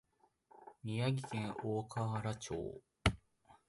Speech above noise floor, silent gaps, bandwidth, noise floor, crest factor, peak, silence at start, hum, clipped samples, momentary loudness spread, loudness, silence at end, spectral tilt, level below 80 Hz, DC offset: 31 dB; none; 11.5 kHz; -71 dBFS; 26 dB; -14 dBFS; 0.55 s; none; under 0.1%; 13 LU; -40 LUFS; 0.15 s; -5.5 dB/octave; -54 dBFS; under 0.1%